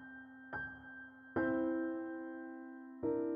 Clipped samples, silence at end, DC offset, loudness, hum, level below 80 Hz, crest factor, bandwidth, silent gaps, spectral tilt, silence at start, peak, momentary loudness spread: under 0.1%; 0 s; under 0.1%; -41 LUFS; none; -70 dBFS; 18 dB; 3.4 kHz; none; -6.5 dB/octave; 0 s; -24 dBFS; 16 LU